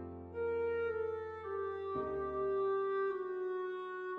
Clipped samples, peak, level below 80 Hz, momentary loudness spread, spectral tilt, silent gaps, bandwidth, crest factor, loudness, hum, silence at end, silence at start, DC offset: under 0.1%; -28 dBFS; -64 dBFS; 7 LU; -8.5 dB/octave; none; 4.2 kHz; 10 dB; -38 LUFS; none; 0 s; 0 s; under 0.1%